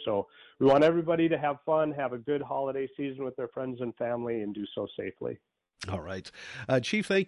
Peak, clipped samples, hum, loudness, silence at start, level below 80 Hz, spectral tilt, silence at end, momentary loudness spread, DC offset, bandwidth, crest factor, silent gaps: -12 dBFS; under 0.1%; none; -30 LUFS; 0 s; -60 dBFS; -6 dB/octave; 0 s; 15 LU; under 0.1%; 11.5 kHz; 18 dB; none